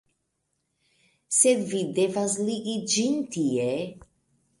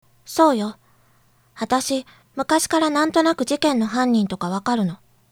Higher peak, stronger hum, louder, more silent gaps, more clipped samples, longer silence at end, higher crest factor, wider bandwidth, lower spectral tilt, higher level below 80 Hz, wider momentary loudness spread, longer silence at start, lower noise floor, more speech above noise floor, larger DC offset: second, -8 dBFS vs -2 dBFS; neither; second, -25 LUFS vs -20 LUFS; neither; neither; first, 0.6 s vs 0.35 s; about the same, 20 dB vs 18 dB; second, 11.5 kHz vs 17.5 kHz; about the same, -3.5 dB/octave vs -4 dB/octave; second, -68 dBFS vs -58 dBFS; about the same, 9 LU vs 11 LU; first, 1.3 s vs 0.3 s; first, -77 dBFS vs -58 dBFS; first, 52 dB vs 38 dB; neither